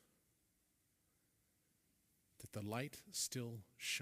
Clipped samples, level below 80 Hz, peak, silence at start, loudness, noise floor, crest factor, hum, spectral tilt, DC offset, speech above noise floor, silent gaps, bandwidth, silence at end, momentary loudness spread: under 0.1%; -82 dBFS; -28 dBFS; 2.4 s; -46 LUFS; -81 dBFS; 24 dB; none; -3 dB/octave; under 0.1%; 35 dB; none; 15.5 kHz; 0 s; 10 LU